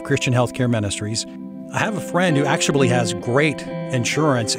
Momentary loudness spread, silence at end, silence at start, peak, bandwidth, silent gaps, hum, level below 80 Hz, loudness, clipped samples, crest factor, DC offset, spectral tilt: 8 LU; 0 s; 0 s; -4 dBFS; 16 kHz; none; none; -54 dBFS; -20 LUFS; under 0.1%; 16 dB; under 0.1%; -4.5 dB/octave